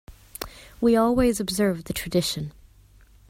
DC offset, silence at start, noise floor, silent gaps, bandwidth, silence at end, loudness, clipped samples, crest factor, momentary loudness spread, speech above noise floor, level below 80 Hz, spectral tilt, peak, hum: under 0.1%; 0.1 s; -53 dBFS; none; 16 kHz; 0.8 s; -23 LUFS; under 0.1%; 16 dB; 18 LU; 31 dB; -44 dBFS; -5 dB/octave; -8 dBFS; none